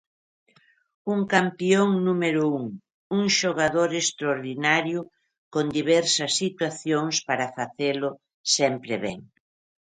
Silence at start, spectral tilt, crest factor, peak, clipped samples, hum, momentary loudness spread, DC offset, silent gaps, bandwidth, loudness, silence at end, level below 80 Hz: 1.05 s; -3.5 dB/octave; 20 dB; -4 dBFS; under 0.1%; none; 11 LU; under 0.1%; 2.94-3.10 s, 5.38-5.51 s, 8.34-8.44 s; 9.6 kHz; -24 LUFS; 0.65 s; -66 dBFS